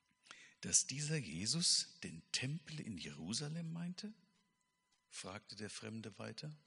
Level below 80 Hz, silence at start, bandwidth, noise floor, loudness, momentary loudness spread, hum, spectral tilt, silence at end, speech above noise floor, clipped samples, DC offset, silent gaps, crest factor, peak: -76 dBFS; 0.25 s; 10.5 kHz; -83 dBFS; -40 LUFS; 18 LU; none; -2.5 dB/octave; 0.1 s; 41 dB; under 0.1%; under 0.1%; none; 26 dB; -18 dBFS